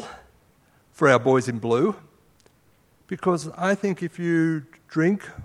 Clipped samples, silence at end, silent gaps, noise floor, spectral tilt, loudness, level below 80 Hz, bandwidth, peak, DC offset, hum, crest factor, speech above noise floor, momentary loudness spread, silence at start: under 0.1%; 0 s; none; -60 dBFS; -6.5 dB/octave; -23 LUFS; -60 dBFS; 12.5 kHz; -2 dBFS; under 0.1%; none; 22 dB; 38 dB; 12 LU; 0 s